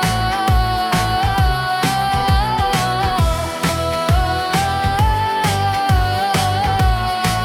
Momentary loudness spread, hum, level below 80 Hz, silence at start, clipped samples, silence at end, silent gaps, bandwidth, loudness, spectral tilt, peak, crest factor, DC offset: 2 LU; none; -24 dBFS; 0 s; under 0.1%; 0 s; none; 18 kHz; -17 LUFS; -4.5 dB/octave; -4 dBFS; 12 dB; under 0.1%